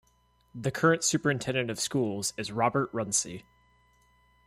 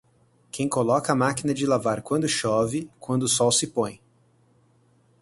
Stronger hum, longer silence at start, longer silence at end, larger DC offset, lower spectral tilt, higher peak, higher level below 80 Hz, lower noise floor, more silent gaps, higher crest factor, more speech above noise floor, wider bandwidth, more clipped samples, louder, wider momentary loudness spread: first, 60 Hz at -60 dBFS vs none; about the same, 0.55 s vs 0.55 s; second, 1.05 s vs 1.25 s; neither; about the same, -3.5 dB/octave vs -4 dB/octave; second, -10 dBFS vs -6 dBFS; about the same, -64 dBFS vs -60 dBFS; first, -67 dBFS vs -62 dBFS; neither; about the same, 20 dB vs 20 dB; about the same, 38 dB vs 38 dB; first, 16 kHz vs 12 kHz; neither; second, -28 LUFS vs -24 LUFS; about the same, 10 LU vs 8 LU